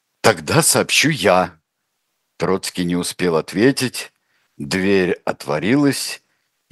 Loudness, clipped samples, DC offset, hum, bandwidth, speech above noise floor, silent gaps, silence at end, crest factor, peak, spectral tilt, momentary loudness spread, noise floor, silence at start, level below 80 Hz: -18 LUFS; under 0.1%; under 0.1%; none; 13 kHz; 56 dB; none; 0.55 s; 18 dB; 0 dBFS; -4 dB/octave; 12 LU; -73 dBFS; 0.25 s; -56 dBFS